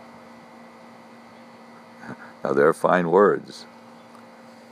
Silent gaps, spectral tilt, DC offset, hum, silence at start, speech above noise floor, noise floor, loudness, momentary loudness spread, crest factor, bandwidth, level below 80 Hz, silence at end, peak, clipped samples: none; -6.5 dB/octave; under 0.1%; none; 2 s; 27 dB; -46 dBFS; -20 LUFS; 25 LU; 22 dB; 13.5 kHz; -72 dBFS; 1.1 s; -4 dBFS; under 0.1%